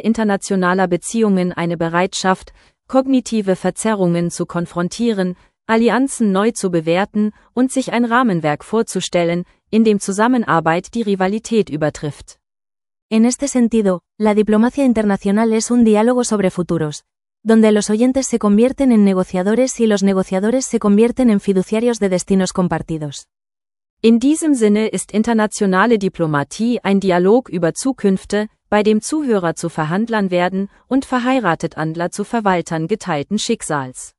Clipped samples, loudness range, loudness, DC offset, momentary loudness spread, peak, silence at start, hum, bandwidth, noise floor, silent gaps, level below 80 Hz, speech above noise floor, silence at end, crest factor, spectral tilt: under 0.1%; 4 LU; -16 LUFS; under 0.1%; 7 LU; 0 dBFS; 0.05 s; none; 12 kHz; under -90 dBFS; 13.02-13.09 s, 23.90-23.97 s; -50 dBFS; over 74 dB; 0.1 s; 16 dB; -5.5 dB/octave